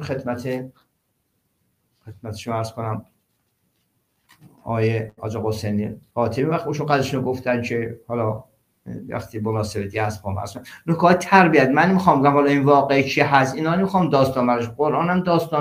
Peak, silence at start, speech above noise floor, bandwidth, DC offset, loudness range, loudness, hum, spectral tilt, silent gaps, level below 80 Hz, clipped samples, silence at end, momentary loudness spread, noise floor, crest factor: -2 dBFS; 0 s; 51 dB; 16 kHz; under 0.1%; 16 LU; -20 LUFS; none; -6.5 dB/octave; none; -56 dBFS; under 0.1%; 0 s; 15 LU; -71 dBFS; 20 dB